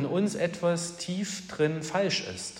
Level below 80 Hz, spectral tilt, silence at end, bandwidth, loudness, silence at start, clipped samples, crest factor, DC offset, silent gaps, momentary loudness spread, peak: -68 dBFS; -4.5 dB/octave; 0 s; 16 kHz; -29 LUFS; 0 s; under 0.1%; 16 dB; under 0.1%; none; 5 LU; -14 dBFS